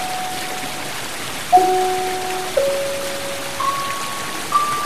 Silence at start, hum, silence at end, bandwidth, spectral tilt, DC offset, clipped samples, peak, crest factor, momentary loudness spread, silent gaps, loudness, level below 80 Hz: 0 s; none; 0 s; 15.5 kHz; -2.5 dB/octave; 2%; under 0.1%; -2 dBFS; 20 dB; 10 LU; none; -21 LUFS; -52 dBFS